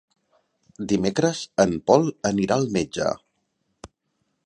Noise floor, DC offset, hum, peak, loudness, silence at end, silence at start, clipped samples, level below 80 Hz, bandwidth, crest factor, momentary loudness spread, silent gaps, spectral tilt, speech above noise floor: -74 dBFS; under 0.1%; none; -2 dBFS; -22 LUFS; 0.6 s; 0.8 s; under 0.1%; -54 dBFS; 10.5 kHz; 22 dB; 8 LU; none; -5.5 dB/octave; 52 dB